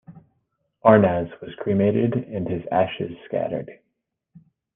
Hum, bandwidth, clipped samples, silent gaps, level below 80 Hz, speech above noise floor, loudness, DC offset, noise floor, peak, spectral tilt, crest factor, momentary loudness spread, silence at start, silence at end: none; 3.8 kHz; under 0.1%; none; -58 dBFS; 56 dB; -22 LUFS; under 0.1%; -78 dBFS; -2 dBFS; -11 dB/octave; 22 dB; 15 LU; 0.1 s; 1 s